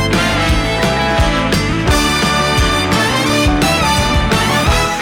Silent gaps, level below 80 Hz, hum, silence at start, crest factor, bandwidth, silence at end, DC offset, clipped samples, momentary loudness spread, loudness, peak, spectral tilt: none; -22 dBFS; none; 0 s; 10 dB; 19.5 kHz; 0 s; under 0.1%; under 0.1%; 2 LU; -13 LUFS; -4 dBFS; -4 dB/octave